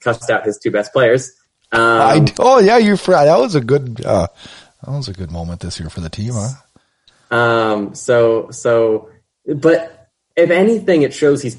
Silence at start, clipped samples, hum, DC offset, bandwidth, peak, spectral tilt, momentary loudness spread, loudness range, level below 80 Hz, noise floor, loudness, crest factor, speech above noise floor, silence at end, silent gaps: 0.05 s; under 0.1%; none; under 0.1%; 11.5 kHz; 0 dBFS; -6 dB/octave; 15 LU; 9 LU; -44 dBFS; -55 dBFS; -14 LUFS; 14 dB; 41 dB; 0 s; none